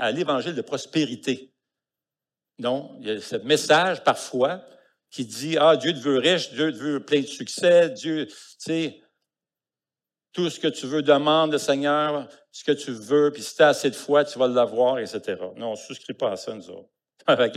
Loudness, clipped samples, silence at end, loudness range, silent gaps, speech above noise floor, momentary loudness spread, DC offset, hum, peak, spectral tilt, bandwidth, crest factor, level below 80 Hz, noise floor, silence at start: -23 LUFS; under 0.1%; 0 s; 5 LU; none; over 67 dB; 14 LU; under 0.1%; none; -4 dBFS; -4 dB/octave; 14.5 kHz; 20 dB; -80 dBFS; under -90 dBFS; 0 s